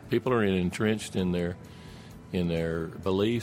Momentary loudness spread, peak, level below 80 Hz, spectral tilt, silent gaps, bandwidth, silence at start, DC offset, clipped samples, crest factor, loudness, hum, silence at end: 20 LU; -12 dBFS; -52 dBFS; -6.5 dB/octave; none; 16 kHz; 0 s; under 0.1%; under 0.1%; 16 dB; -29 LUFS; none; 0 s